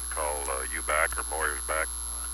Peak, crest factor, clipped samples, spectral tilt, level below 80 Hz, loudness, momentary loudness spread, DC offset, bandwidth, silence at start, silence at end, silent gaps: -10 dBFS; 22 dB; under 0.1%; -1.5 dB/octave; -40 dBFS; -29 LUFS; 4 LU; under 0.1%; over 20 kHz; 0 s; 0 s; none